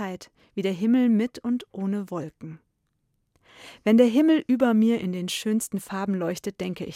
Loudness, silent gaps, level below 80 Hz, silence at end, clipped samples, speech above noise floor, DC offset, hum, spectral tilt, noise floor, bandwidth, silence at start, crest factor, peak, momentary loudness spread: -24 LUFS; none; -66 dBFS; 0 s; under 0.1%; 50 dB; under 0.1%; none; -6 dB/octave; -74 dBFS; 15.5 kHz; 0 s; 18 dB; -6 dBFS; 15 LU